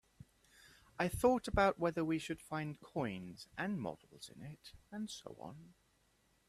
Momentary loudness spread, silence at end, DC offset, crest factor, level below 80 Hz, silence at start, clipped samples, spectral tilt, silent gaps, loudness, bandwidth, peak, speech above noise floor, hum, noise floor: 20 LU; 0.8 s; under 0.1%; 22 dB; -58 dBFS; 0.65 s; under 0.1%; -5.5 dB/octave; none; -38 LUFS; 14.5 kHz; -18 dBFS; 36 dB; none; -75 dBFS